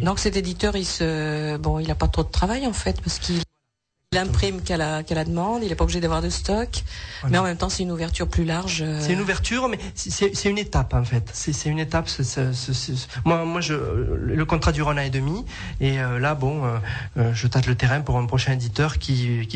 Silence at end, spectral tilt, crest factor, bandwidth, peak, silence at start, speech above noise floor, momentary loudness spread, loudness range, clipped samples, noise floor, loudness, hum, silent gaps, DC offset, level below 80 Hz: 0 s; -5 dB/octave; 16 dB; 9.2 kHz; -6 dBFS; 0 s; 53 dB; 5 LU; 2 LU; under 0.1%; -76 dBFS; -24 LUFS; none; none; under 0.1%; -32 dBFS